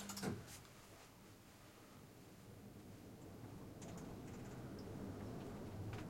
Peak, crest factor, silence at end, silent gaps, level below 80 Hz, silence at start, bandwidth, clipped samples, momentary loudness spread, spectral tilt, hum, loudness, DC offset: -32 dBFS; 20 dB; 0 s; none; -68 dBFS; 0 s; 16.5 kHz; under 0.1%; 12 LU; -5.5 dB/octave; none; -54 LUFS; under 0.1%